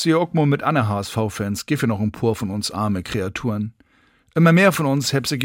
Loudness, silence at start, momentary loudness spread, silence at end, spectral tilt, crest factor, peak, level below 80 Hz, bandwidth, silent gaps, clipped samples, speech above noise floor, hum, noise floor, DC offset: -20 LUFS; 0 s; 10 LU; 0 s; -5.5 dB/octave; 16 dB; -4 dBFS; -52 dBFS; 17 kHz; none; under 0.1%; 39 dB; none; -58 dBFS; under 0.1%